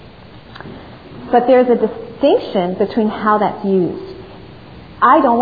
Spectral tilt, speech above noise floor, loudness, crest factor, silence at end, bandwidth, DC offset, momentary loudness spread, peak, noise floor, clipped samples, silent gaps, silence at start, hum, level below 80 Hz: -9.5 dB/octave; 25 dB; -15 LUFS; 16 dB; 0 s; 5 kHz; 0.3%; 23 LU; 0 dBFS; -38 dBFS; under 0.1%; none; 0.05 s; none; -48 dBFS